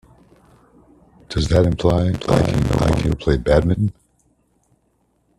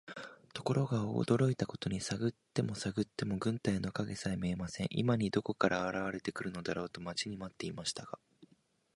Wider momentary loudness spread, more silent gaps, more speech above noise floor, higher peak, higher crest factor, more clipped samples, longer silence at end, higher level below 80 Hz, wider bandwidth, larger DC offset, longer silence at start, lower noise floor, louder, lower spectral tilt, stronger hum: second, 6 LU vs 9 LU; neither; first, 47 dB vs 36 dB; first, 0 dBFS vs -12 dBFS; about the same, 20 dB vs 24 dB; neither; first, 1.5 s vs 0.5 s; first, -32 dBFS vs -62 dBFS; first, 13 kHz vs 11.5 kHz; neither; first, 1.3 s vs 0.05 s; second, -64 dBFS vs -72 dBFS; first, -18 LUFS vs -36 LUFS; first, -7 dB/octave vs -5.5 dB/octave; neither